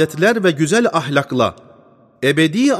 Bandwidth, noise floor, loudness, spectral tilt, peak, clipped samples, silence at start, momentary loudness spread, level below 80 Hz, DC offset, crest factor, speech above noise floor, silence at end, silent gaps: 15 kHz; -49 dBFS; -16 LUFS; -5 dB/octave; -2 dBFS; under 0.1%; 0 s; 5 LU; -58 dBFS; under 0.1%; 14 dB; 33 dB; 0 s; none